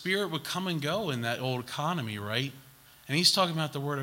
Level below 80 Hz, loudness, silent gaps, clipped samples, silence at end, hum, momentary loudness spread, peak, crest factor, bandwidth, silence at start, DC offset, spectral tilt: -70 dBFS; -29 LUFS; none; under 0.1%; 0 s; none; 9 LU; -10 dBFS; 22 dB; 16.5 kHz; 0 s; under 0.1%; -4 dB/octave